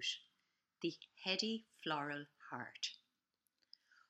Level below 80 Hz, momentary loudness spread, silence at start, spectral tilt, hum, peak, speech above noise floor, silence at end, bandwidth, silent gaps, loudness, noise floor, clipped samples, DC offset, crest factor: under -90 dBFS; 11 LU; 0 s; -3 dB/octave; none; -22 dBFS; 44 dB; 1.15 s; 12.5 kHz; none; -43 LUFS; -88 dBFS; under 0.1%; under 0.1%; 24 dB